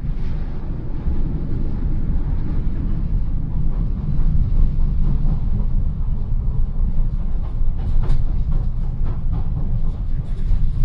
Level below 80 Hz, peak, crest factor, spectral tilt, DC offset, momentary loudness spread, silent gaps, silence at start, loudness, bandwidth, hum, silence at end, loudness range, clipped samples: -18 dBFS; -4 dBFS; 12 dB; -10.5 dB/octave; under 0.1%; 5 LU; none; 0 s; -25 LUFS; 2.2 kHz; none; 0 s; 2 LU; under 0.1%